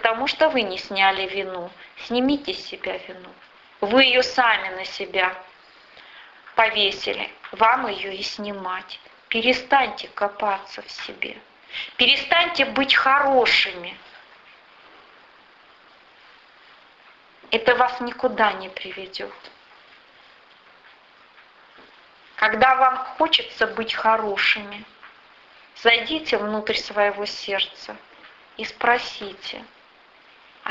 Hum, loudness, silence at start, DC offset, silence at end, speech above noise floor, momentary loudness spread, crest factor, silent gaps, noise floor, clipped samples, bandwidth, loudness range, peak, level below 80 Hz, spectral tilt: none; -21 LUFS; 0 s; under 0.1%; 0 s; 30 dB; 18 LU; 22 dB; none; -52 dBFS; under 0.1%; 8 kHz; 8 LU; -2 dBFS; -60 dBFS; -3 dB/octave